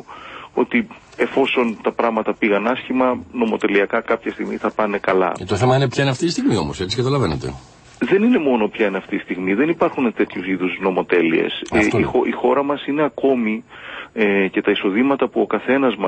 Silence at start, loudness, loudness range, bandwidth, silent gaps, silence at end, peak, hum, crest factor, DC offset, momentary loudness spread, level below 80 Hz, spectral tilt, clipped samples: 0.1 s; -19 LUFS; 1 LU; 8.8 kHz; none; 0 s; -2 dBFS; none; 18 dB; under 0.1%; 7 LU; -48 dBFS; -6 dB/octave; under 0.1%